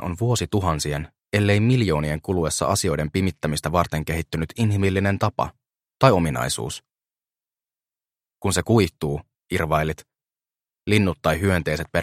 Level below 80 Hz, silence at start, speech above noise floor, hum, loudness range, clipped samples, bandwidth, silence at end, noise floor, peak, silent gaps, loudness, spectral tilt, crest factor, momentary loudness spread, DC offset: -42 dBFS; 0 s; over 69 dB; none; 3 LU; under 0.1%; 16 kHz; 0 s; under -90 dBFS; 0 dBFS; none; -22 LUFS; -5.5 dB/octave; 22 dB; 10 LU; under 0.1%